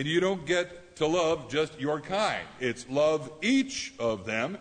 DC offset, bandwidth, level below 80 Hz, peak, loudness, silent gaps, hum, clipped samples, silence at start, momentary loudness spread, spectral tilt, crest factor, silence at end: under 0.1%; 9.6 kHz; -60 dBFS; -14 dBFS; -29 LUFS; none; none; under 0.1%; 0 s; 6 LU; -4.5 dB/octave; 14 dB; 0 s